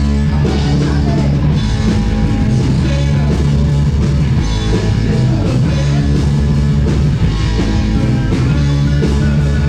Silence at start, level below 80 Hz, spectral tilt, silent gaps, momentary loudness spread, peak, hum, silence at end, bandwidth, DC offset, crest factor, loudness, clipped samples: 0 s; -18 dBFS; -7.5 dB/octave; none; 1 LU; -2 dBFS; none; 0 s; 9.4 kHz; under 0.1%; 10 dB; -14 LUFS; under 0.1%